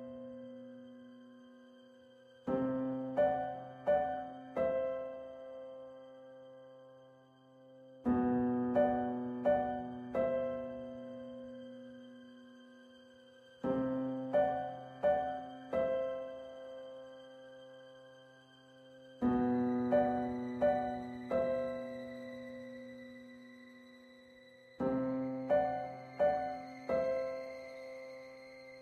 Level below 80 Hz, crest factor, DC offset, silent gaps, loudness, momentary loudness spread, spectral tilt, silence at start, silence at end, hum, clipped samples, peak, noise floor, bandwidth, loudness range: -66 dBFS; 18 dB; under 0.1%; none; -36 LUFS; 23 LU; -8 dB/octave; 0 s; 0 s; none; under 0.1%; -20 dBFS; -62 dBFS; 6.6 kHz; 9 LU